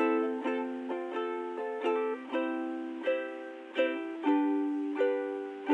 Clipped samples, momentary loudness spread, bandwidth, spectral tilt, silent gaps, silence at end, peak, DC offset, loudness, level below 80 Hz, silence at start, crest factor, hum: under 0.1%; 8 LU; 8.6 kHz; -4.5 dB/octave; none; 0 s; -16 dBFS; under 0.1%; -33 LUFS; under -90 dBFS; 0 s; 16 dB; none